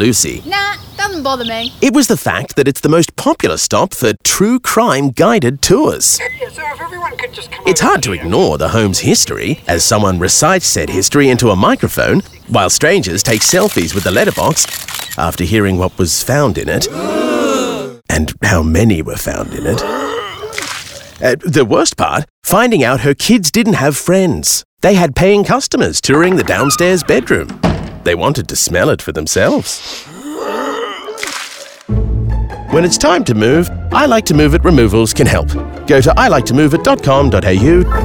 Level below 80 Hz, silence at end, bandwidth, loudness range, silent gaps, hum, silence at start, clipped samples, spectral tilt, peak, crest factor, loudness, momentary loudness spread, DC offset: -28 dBFS; 0 s; over 20 kHz; 5 LU; 22.30-22.42 s, 24.65-24.77 s; none; 0 s; under 0.1%; -4 dB/octave; 0 dBFS; 12 dB; -12 LUFS; 11 LU; under 0.1%